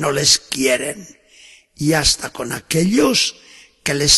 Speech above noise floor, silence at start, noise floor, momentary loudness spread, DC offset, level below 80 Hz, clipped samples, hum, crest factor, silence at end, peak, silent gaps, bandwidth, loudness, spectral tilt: 30 dB; 0 s; -47 dBFS; 12 LU; under 0.1%; -40 dBFS; under 0.1%; none; 18 dB; 0 s; 0 dBFS; none; 13 kHz; -17 LUFS; -2.5 dB/octave